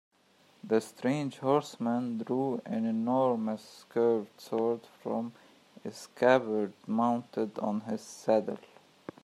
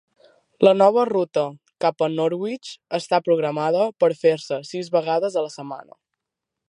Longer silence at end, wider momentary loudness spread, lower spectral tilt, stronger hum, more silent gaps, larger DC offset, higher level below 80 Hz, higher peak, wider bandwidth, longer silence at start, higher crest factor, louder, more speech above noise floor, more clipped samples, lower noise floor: second, 0.65 s vs 0.85 s; about the same, 14 LU vs 13 LU; about the same, -6.5 dB/octave vs -6 dB/octave; neither; neither; neither; about the same, -80 dBFS vs -76 dBFS; second, -10 dBFS vs -2 dBFS; first, 13.5 kHz vs 11 kHz; about the same, 0.65 s vs 0.6 s; about the same, 22 dB vs 20 dB; second, -31 LUFS vs -21 LUFS; second, 34 dB vs 63 dB; neither; second, -64 dBFS vs -84 dBFS